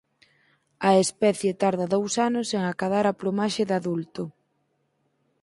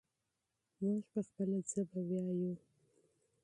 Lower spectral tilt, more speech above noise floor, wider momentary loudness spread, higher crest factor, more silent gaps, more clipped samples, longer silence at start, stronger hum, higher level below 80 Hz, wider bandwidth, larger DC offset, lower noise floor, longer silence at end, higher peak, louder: second, -5 dB/octave vs -8.5 dB/octave; about the same, 48 dB vs 49 dB; first, 10 LU vs 5 LU; about the same, 18 dB vs 16 dB; neither; neither; about the same, 0.8 s vs 0.8 s; neither; first, -68 dBFS vs -84 dBFS; about the same, 11.5 kHz vs 11 kHz; neither; second, -72 dBFS vs -87 dBFS; first, 1.1 s vs 0.85 s; first, -6 dBFS vs -26 dBFS; first, -24 LUFS vs -40 LUFS